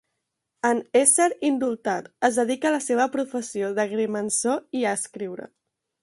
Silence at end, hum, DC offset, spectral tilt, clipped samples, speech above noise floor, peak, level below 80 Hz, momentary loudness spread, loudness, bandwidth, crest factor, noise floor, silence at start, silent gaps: 0.55 s; none; under 0.1%; -3 dB/octave; under 0.1%; 56 dB; -4 dBFS; -72 dBFS; 11 LU; -23 LUFS; 12 kHz; 20 dB; -80 dBFS; 0.65 s; none